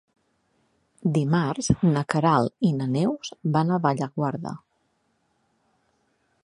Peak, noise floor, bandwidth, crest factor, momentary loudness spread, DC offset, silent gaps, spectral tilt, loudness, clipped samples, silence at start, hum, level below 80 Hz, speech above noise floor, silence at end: -4 dBFS; -70 dBFS; 11 kHz; 22 dB; 8 LU; under 0.1%; none; -6.5 dB/octave; -24 LUFS; under 0.1%; 1.05 s; none; -54 dBFS; 47 dB; 1.85 s